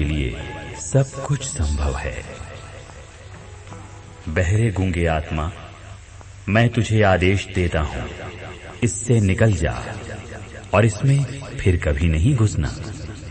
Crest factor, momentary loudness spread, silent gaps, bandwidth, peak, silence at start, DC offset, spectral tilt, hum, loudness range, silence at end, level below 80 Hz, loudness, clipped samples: 18 dB; 21 LU; none; 8.8 kHz; -2 dBFS; 0 s; under 0.1%; -6 dB/octave; none; 6 LU; 0 s; -32 dBFS; -21 LUFS; under 0.1%